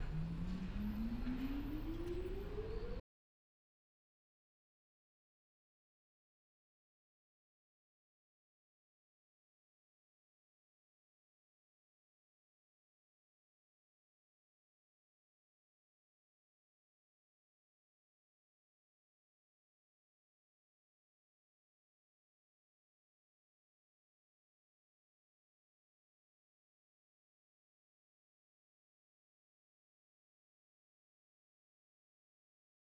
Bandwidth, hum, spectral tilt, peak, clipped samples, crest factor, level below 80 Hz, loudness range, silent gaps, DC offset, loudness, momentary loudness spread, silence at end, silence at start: 17 kHz; none; -8 dB/octave; -30 dBFS; under 0.1%; 22 dB; -56 dBFS; 11 LU; none; under 0.1%; -45 LUFS; 4 LU; 29.9 s; 0 s